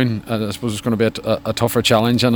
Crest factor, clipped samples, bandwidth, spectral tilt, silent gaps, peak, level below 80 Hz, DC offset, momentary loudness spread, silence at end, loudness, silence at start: 18 dB; under 0.1%; over 20 kHz; -5.5 dB/octave; none; 0 dBFS; -46 dBFS; under 0.1%; 8 LU; 0 s; -18 LUFS; 0 s